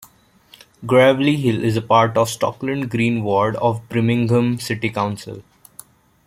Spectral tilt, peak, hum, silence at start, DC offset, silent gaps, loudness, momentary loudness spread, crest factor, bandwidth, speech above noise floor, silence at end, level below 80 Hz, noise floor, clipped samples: -6 dB/octave; -2 dBFS; none; 0.8 s; under 0.1%; none; -18 LUFS; 10 LU; 16 dB; 16.5 kHz; 33 dB; 0.85 s; -56 dBFS; -51 dBFS; under 0.1%